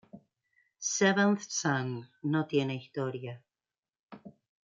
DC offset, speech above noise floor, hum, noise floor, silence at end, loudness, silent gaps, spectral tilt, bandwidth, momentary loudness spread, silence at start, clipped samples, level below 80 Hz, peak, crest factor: under 0.1%; over 60 dB; none; under -90 dBFS; 0.4 s; -30 LUFS; 3.79-3.83 s, 3.99-4.08 s; -4.5 dB/octave; 8.8 kHz; 19 LU; 0.15 s; under 0.1%; -80 dBFS; -12 dBFS; 22 dB